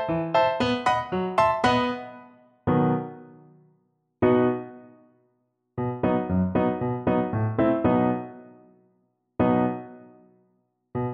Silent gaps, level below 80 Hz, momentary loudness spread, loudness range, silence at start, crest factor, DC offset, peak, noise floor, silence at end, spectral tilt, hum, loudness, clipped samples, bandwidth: none; -52 dBFS; 16 LU; 3 LU; 0 s; 18 dB; under 0.1%; -6 dBFS; -72 dBFS; 0 s; -7.5 dB/octave; none; -24 LUFS; under 0.1%; 9.4 kHz